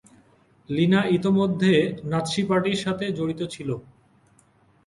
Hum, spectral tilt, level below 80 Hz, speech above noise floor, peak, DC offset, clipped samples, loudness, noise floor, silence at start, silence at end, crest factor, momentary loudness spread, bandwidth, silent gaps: none; -6.5 dB/octave; -58 dBFS; 37 dB; -8 dBFS; under 0.1%; under 0.1%; -23 LUFS; -60 dBFS; 0.7 s; 1.05 s; 16 dB; 11 LU; 11.5 kHz; none